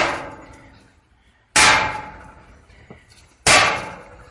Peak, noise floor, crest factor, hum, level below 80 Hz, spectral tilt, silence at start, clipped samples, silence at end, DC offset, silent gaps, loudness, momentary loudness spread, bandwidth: 0 dBFS; -57 dBFS; 20 dB; none; -46 dBFS; -1 dB/octave; 0 s; under 0.1%; 0.3 s; under 0.1%; none; -15 LUFS; 22 LU; 11.5 kHz